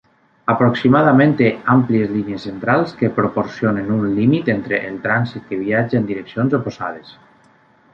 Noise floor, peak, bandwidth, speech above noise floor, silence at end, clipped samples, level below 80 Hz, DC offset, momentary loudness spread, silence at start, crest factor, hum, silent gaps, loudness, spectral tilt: -53 dBFS; -2 dBFS; 6.8 kHz; 36 dB; 0.8 s; under 0.1%; -54 dBFS; under 0.1%; 11 LU; 0.45 s; 16 dB; none; none; -17 LUFS; -9 dB/octave